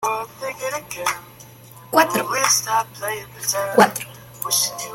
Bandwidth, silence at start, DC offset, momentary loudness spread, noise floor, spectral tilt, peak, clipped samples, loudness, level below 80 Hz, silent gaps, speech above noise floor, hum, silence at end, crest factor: 17 kHz; 0 s; under 0.1%; 13 LU; -43 dBFS; -2 dB/octave; 0 dBFS; under 0.1%; -20 LUFS; -60 dBFS; none; 22 dB; none; 0 s; 22 dB